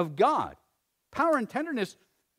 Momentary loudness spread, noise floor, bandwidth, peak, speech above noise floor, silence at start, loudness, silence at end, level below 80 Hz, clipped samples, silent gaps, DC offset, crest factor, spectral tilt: 12 LU; -76 dBFS; 16 kHz; -10 dBFS; 49 dB; 0 s; -28 LUFS; 0.45 s; -66 dBFS; under 0.1%; none; under 0.1%; 18 dB; -6 dB/octave